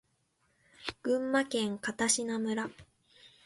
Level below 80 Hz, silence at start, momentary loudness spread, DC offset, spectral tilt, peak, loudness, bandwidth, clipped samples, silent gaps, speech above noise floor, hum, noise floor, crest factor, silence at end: -68 dBFS; 0.8 s; 13 LU; under 0.1%; -2.5 dB/octave; -14 dBFS; -32 LUFS; 12 kHz; under 0.1%; none; 43 dB; none; -75 dBFS; 22 dB; 0.2 s